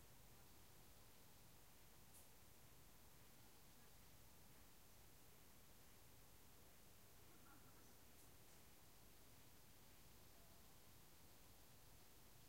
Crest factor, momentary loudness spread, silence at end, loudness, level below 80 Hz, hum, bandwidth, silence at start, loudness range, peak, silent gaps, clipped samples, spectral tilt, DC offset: 16 dB; 1 LU; 0 s; -68 LUFS; -76 dBFS; none; 16 kHz; 0 s; 0 LU; -52 dBFS; none; under 0.1%; -3 dB/octave; under 0.1%